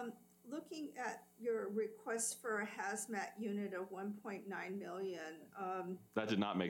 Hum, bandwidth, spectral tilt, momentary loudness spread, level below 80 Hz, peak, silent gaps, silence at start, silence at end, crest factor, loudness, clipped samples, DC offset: none; 19 kHz; -4 dB/octave; 9 LU; -90 dBFS; -24 dBFS; none; 0 s; 0 s; 20 dB; -43 LUFS; under 0.1%; under 0.1%